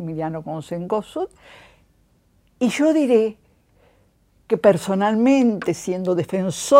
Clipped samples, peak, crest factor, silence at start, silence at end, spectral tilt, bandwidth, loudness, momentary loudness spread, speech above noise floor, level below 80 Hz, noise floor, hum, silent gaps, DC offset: under 0.1%; 0 dBFS; 20 dB; 0 s; 0 s; -6 dB/octave; 16 kHz; -21 LUFS; 13 LU; 41 dB; -60 dBFS; -60 dBFS; none; none; under 0.1%